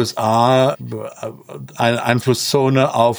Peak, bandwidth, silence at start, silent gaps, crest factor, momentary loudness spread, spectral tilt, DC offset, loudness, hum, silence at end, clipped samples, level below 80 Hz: -2 dBFS; over 20 kHz; 0 s; none; 14 dB; 17 LU; -5 dB/octave; under 0.1%; -16 LUFS; none; 0 s; under 0.1%; -58 dBFS